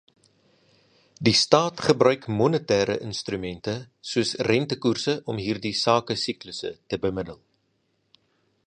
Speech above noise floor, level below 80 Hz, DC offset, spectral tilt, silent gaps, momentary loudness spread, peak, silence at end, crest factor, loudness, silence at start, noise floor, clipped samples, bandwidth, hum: 47 dB; -56 dBFS; under 0.1%; -4.5 dB/octave; none; 12 LU; 0 dBFS; 1.3 s; 26 dB; -24 LUFS; 1.2 s; -71 dBFS; under 0.1%; 11 kHz; none